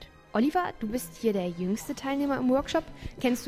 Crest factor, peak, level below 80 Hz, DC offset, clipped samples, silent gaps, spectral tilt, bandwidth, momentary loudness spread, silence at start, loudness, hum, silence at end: 16 dB; -12 dBFS; -50 dBFS; under 0.1%; under 0.1%; none; -5.5 dB/octave; 15.5 kHz; 7 LU; 0 s; -29 LUFS; none; 0 s